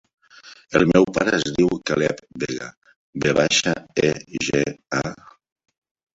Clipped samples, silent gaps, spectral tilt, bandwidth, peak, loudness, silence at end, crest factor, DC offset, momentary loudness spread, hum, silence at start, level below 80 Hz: under 0.1%; 2.77-2.82 s, 2.96-3.13 s; -4.5 dB/octave; 8 kHz; -2 dBFS; -21 LUFS; 1 s; 20 dB; under 0.1%; 12 LU; none; 0.45 s; -52 dBFS